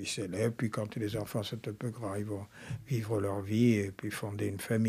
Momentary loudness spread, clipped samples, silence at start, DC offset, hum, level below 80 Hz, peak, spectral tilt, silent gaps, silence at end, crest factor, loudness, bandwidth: 11 LU; under 0.1%; 0 s; under 0.1%; none; -66 dBFS; -16 dBFS; -6 dB/octave; none; 0 s; 18 dB; -34 LUFS; 15.5 kHz